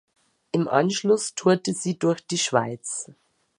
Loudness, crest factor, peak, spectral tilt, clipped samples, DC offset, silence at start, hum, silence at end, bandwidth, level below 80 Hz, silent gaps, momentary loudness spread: -24 LUFS; 20 dB; -4 dBFS; -4.5 dB/octave; under 0.1%; under 0.1%; 0.55 s; none; 0.55 s; 11.5 kHz; -72 dBFS; none; 9 LU